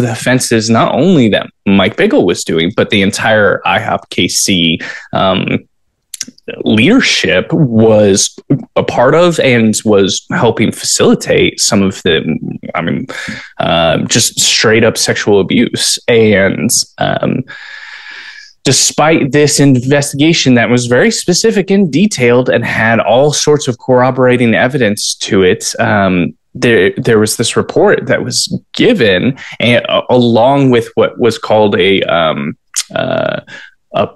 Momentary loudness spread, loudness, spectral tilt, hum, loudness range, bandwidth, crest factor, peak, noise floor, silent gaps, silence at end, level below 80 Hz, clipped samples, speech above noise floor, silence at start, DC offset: 10 LU; -10 LUFS; -4 dB/octave; none; 3 LU; 12.5 kHz; 10 dB; 0 dBFS; -34 dBFS; none; 0.05 s; -46 dBFS; under 0.1%; 24 dB; 0 s; 0.2%